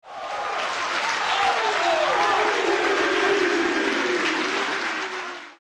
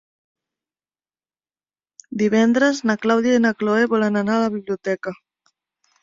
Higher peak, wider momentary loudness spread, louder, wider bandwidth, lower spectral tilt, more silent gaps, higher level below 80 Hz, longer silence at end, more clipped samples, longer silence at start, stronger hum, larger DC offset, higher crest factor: second, -12 dBFS vs -4 dBFS; about the same, 8 LU vs 9 LU; second, -22 LUFS vs -19 LUFS; first, 12.5 kHz vs 7.6 kHz; second, -1.5 dB/octave vs -5.5 dB/octave; neither; about the same, -62 dBFS vs -64 dBFS; second, 0.1 s vs 0.9 s; neither; second, 0.05 s vs 2.1 s; neither; neither; about the same, 12 dB vs 16 dB